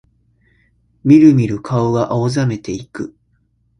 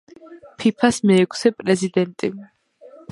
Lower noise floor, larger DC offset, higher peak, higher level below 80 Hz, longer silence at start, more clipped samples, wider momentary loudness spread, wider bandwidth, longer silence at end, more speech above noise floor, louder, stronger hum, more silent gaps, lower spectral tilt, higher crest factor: first, -60 dBFS vs -46 dBFS; neither; about the same, 0 dBFS vs -2 dBFS; first, -48 dBFS vs -60 dBFS; first, 1.05 s vs 0.25 s; neither; first, 19 LU vs 11 LU; about the same, 10.5 kHz vs 11.5 kHz; about the same, 0.75 s vs 0.65 s; first, 47 dB vs 28 dB; first, -14 LUFS vs -19 LUFS; neither; neither; first, -8 dB/octave vs -5.5 dB/octave; about the same, 16 dB vs 18 dB